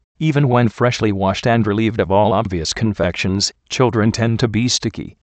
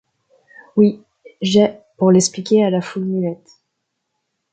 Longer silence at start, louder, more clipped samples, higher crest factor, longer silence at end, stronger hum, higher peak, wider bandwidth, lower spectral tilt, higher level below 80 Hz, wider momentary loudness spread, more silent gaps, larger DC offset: second, 0.2 s vs 0.75 s; about the same, -17 LUFS vs -17 LUFS; neither; about the same, 16 dB vs 16 dB; second, 0.25 s vs 1.2 s; neither; about the same, 0 dBFS vs -2 dBFS; about the same, 9 kHz vs 9.2 kHz; about the same, -5.5 dB/octave vs -5.5 dB/octave; first, -42 dBFS vs -62 dBFS; second, 4 LU vs 11 LU; neither; neither